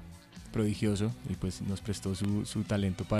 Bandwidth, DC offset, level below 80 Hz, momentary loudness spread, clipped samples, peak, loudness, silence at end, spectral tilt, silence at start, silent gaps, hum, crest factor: 14 kHz; under 0.1%; -52 dBFS; 7 LU; under 0.1%; -18 dBFS; -33 LUFS; 0 s; -6.5 dB/octave; 0 s; none; none; 14 dB